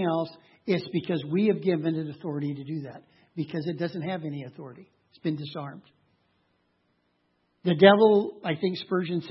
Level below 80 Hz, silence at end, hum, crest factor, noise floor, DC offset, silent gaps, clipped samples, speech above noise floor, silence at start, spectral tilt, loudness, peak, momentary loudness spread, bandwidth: -76 dBFS; 0 s; none; 26 dB; -72 dBFS; under 0.1%; none; under 0.1%; 46 dB; 0 s; -9.5 dB/octave; -26 LUFS; -2 dBFS; 19 LU; 6 kHz